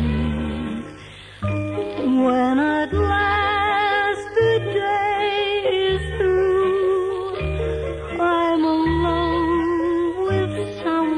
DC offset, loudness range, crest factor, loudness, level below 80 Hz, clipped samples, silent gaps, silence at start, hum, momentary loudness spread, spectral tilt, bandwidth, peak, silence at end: under 0.1%; 2 LU; 12 dB; -20 LUFS; -36 dBFS; under 0.1%; none; 0 s; none; 8 LU; -7 dB/octave; 10.5 kHz; -8 dBFS; 0 s